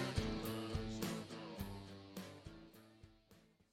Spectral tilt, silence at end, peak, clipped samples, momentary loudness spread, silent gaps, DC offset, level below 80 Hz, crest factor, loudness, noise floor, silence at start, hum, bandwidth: -5.5 dB/octave; 0.3 s; -24 dBFS; under 0.1%; 20 LU; none; under 0.1%; -56 dBFS; 22 dB; -46 LUFS; -69 dBFS; 0 s; none; 16 kHz